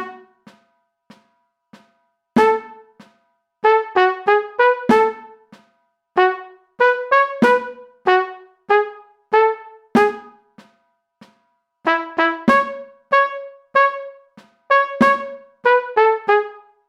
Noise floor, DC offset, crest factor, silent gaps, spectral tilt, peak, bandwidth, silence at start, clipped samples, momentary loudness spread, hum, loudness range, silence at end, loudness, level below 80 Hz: -66 dBFS; under 0.1%; 18 dB; none; -5.5 dB/octave; -2 dBFS; 11.5 kHz; 0 s; under 0.1%; 15 LU; none; 4 LU; 0.3 s; -17 LUFS; -62 dBFS